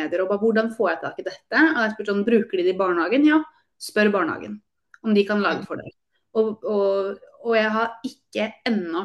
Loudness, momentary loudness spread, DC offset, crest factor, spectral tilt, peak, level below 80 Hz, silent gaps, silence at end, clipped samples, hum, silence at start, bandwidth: -22 LUFS; 14 LU; under 0.1%; 16 dB; -6 dB/octave; -6 dBFS; -70 dBFS; none; 0 s; under 0.1%; none; 0 s; 12.5 kHz